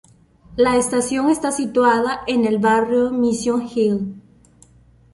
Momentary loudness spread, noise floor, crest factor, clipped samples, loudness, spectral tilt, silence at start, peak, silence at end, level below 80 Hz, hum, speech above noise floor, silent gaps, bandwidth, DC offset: 5 LU; -51 dBFS; 16 dB; under 0.1%; -18 LUFS; -4.5 dB/octave; 0.5 s; -4 dBFS; 0.95 s; -50 dBFS; none; 34 dB; none; 11.5 kHz; under 0.1%